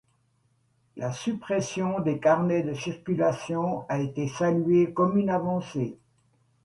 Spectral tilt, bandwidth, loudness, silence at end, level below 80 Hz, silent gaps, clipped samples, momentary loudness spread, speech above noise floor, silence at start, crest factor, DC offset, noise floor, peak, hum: -7 dB/octave; 11.5 kHz; -27 LUFS; 0.7 s; -64 dBFS; none; under 0.1%; 10 LU; 43 dB; 0.95 s; 18 dB; under 0.1%; -69 dBFS; -10 dBFS; none